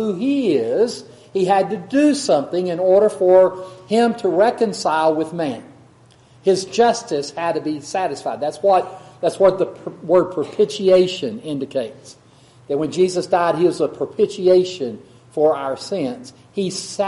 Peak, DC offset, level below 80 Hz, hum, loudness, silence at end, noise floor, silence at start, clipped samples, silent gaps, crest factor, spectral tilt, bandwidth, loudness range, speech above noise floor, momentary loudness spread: 0 dBFS; under 0.1%; -62 dBFS; none; -19 LUFS; 0 s; -50 dBFS; 0 s; under 0.1%; none; 18 dB; -5 dB/octave; 11.5 kHz; 4 LU; 32 dB; 11 LU